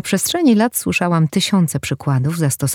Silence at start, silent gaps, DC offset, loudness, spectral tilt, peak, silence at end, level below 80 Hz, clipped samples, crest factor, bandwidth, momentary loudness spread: 0.05 s; none; under 0.1%; -16 LUFS; -5 dB/octave; -2 dBFS; 0 s; -52 dBFS; under 0.1%; 14 dB; 19.5 kHz; 5 LU